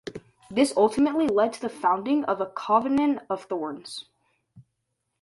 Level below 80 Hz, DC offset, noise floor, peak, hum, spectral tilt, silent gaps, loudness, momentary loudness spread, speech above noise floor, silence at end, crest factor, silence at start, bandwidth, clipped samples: -64 dBFS; under 0.1%; -79 dBFS; -8 dBFS; none; -5 dB/octave; none; -25 LUFS; 16 LU; 55 dB; 0.6 s; 18 dB; 0.05 s; 11.5 kHz; under 0.1%